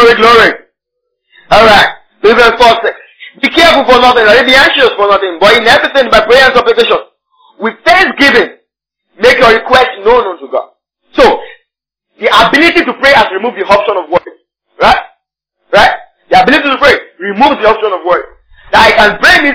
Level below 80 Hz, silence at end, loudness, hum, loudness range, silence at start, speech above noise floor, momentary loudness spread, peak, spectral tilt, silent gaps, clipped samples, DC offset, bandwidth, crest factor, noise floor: -34 dBFS; 0 s; -6 LUFS; none; 4 LU; 0 s; 65 dB; 11 LU; 0 dBFS; -4 dB/octave; none; 5%; under 0.1%; 5.4 kHz; 8 dB; -71 dBFS